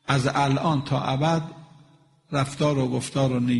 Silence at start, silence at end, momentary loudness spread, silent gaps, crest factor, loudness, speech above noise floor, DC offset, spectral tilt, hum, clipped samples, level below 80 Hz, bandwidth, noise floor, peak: 0.1 s; 0 s; 5 LU; none; 20 dB; -24 LUFS; 33 dB; under 0.1%; -6 dB/octave; none; under 0.1%; -56 dBFS; 11.5 kHz; -56 dBFS; -4 dBFS